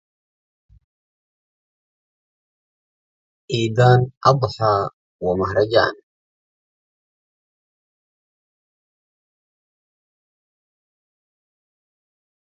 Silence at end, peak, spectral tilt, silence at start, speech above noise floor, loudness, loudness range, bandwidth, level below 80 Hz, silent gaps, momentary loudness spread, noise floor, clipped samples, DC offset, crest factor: 6.45 s; 0 dBFS; -6.5 dB/octave; 3.5 s; over 73 dB; -18 LUFS; 7 LU; 7.8 kHz; -52 dBFS; 4.17-4.21 s, 4.93-5.19 s; 10 LU; under -90 dBFS; under 0.1%; under 0.1%; 24 dB